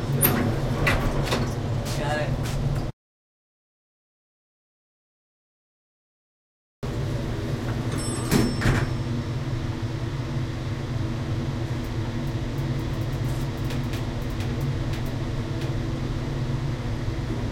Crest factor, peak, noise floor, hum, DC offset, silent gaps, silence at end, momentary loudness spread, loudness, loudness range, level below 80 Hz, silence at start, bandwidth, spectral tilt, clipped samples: 20 dB; -6 dBFS; under -90 dBFS; none; under 0.1%; 2.93-6.82 s; 0 s; 7 LU; -27 LUFS; 8 LU; -36 dBFS; 0 s; 16.5 kHz; -6 dB/octave; under 0.1%